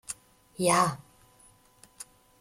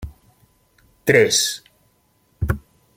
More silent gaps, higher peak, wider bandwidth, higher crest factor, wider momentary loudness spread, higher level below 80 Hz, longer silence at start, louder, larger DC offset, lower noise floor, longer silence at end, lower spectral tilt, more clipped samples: neither; second, -10 dBFS vs -2 dBFS; about the same, 16.5 kHz vs 16.5 kHz; about the same, 22 dB vs 22 dB; first, 23 LU vs 18 LU; second, -66 dBFS vs -38 dBFS; about the same, 0.1 s vs 0 s; second, -26 LUFS vs -19 LUFS; neither; about the same, -60 dBFS vs -62 dBFS; about the same, 0.35 s vs 0.35 s; about the same, -3.5 dB/octave vs -3 dB/octave; neither